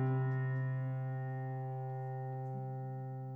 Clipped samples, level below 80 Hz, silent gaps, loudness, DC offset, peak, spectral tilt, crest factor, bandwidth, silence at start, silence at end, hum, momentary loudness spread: under 0.1%; -80 dBFS; none; -39 LUFS; under 0.1%; -26 dBFS; -11 dB/octave; 12 dB; 3 kHz; 0 s; 0 s; none; 7 LU